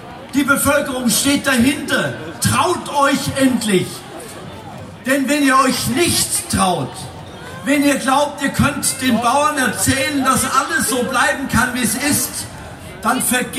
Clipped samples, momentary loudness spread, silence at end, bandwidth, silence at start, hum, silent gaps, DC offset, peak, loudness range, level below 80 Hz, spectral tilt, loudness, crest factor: under 0.1%; 16 LU; 0 s; 16 kHz; 0 s; none; none; under 0.1%; -2 dBFS; 2 LU; -44 dBFS; -3.5 dB/octave; -16 LUFS; 16 dB